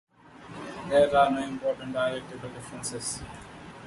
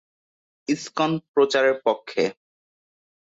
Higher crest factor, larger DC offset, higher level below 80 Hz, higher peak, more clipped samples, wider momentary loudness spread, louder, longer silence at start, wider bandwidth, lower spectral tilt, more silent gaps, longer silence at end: about the same, 20 dB vs 18 dB; neither; first, -56 dBFS vs -70 dBFS; about the same, -8 dBFS vs -8 dBFS; neither; first, 21 LU vs 9 LU; second, -27 LUFS vs -23 LUFS; second, 0.3 s vs 0.7 s; first, 11.5 kHz vs 8 kHz; about the same, -4 dB/octave vs -4.5 dB/octave; second, none vs 1.28-1.34 s; second, 0 s vs 0.95 s